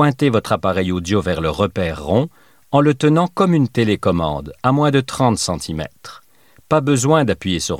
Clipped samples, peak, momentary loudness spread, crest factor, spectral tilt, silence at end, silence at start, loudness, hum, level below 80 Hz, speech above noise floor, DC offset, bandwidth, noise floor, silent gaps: under 0.1%; -2 dBFS; 7 LU; 16 dB; -6 dB/octave; 0 s; 0 s; -17 LUFS; none; -42 dBFS; 28 dB; 0.2%; 15.5 kHz; -45 dBFS; none